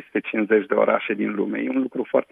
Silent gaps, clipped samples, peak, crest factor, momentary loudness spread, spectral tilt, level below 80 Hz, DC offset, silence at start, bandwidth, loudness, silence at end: none; under 0.1%; -4 dBFS; 18 dB; 5 LU; -8.5 dB/octave; -78 dBFS; under 0.1%; 0 s; 3.9 kHz; -22 LUFS; 0.1 s